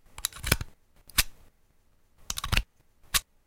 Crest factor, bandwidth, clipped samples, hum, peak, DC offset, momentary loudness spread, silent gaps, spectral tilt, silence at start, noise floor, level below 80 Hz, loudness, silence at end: 32 dB; 17 kHz; under 0.1%; none; 0 dBFS; under 0.1%; 9 LU; none; -1.5 dB/octave; 0.15 s; -63 dBFS; -40 dBFS; -30 LUFS; 0.25 s